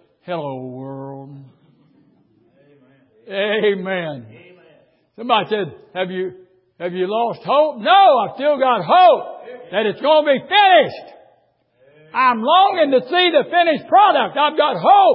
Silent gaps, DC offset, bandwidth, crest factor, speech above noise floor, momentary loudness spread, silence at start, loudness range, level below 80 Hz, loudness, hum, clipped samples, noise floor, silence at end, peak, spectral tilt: none; under 0.1%; 5.6 kHz; 16 dB; 44 dB; 18 LU; 0.25 s; 10 LU; -72 dBFS; -16 LUFS; none; under 0.1%; -60 dBFS; 0 s; 0 dBFS; -9.5 dB/octave